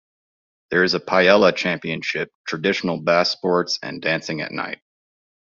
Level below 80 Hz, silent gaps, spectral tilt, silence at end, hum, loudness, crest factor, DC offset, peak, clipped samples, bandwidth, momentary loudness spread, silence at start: -62 dBFS; 2.35-2.44 s; -2.5 dB/octave; 0.8 s; none; -20 LUFS; 20 dB; under 0.1%; -2 dBFS; under 0.1%; 7.4 kHz; 12 LU; 0.7 s